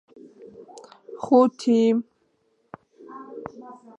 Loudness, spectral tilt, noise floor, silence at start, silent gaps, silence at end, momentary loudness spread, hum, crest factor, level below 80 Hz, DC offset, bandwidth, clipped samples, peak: -20 LUFS; -6.5 dB/octave; -68 dBFS; 0.45 s; none; 0.25 s; 26 LU; none; 22 dB; -72 dBFS; under 0.1%; 8.8 kHz; under 0.1%; -4 dBFS